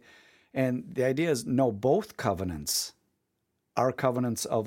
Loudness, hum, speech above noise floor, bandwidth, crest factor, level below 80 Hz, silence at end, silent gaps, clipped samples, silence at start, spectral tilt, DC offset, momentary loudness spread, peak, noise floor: -29 LUFS; none; 51 dB; 17 kHz; 20 dB; -60 dBFS; 0 s; none; under 0.1%; 0.55 s; -5 dB/octave; under 0.1%; 6 LU; -10 dBFS; -79 dBFS